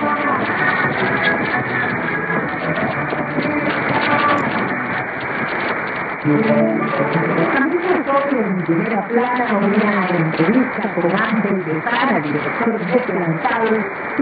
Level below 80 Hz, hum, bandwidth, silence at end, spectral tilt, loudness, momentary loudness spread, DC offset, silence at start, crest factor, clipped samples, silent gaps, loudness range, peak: -54 dBFS; none; 5 kHz; 0 s; -9 dB/octave; -18 LUFS; 5 LU; under 0.1%; 0 s; 16 dB; under 0.1%; none; 1 LU; -2 dBFS